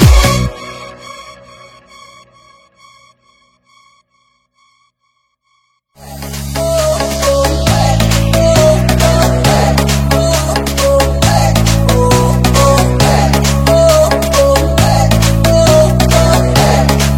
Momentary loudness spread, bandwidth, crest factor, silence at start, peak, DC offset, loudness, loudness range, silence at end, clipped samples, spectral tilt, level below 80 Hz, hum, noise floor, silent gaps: 11 LU; 17 kHz; 10 dB; 0 s; 0 dBFS; under 0.1%; -10 LUFS; 9 LU; 0 s; 0.7%; -5 dB/octave; -18 dBFS; none; -63 dBFS; none